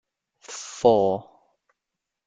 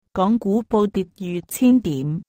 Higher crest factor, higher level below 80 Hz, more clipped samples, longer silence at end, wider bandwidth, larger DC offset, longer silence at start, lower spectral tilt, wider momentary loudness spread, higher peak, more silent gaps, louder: first, 22 dB vs 14 dB; second, -64 dBFS vs -50 dBFS; neither; first, 1.05 s vs 0.05 s; second, 9.4 kHz vs 16 kHz; neither; first, 0.5 s vs 0.15 s; second, -5 dB/octave vs -7 dB/octave; first, 18 LU vs 10 LU; about the same, -6 dBFS vs -6 dBFS; neither; about the same, -22 LUFS vs -20 LUFS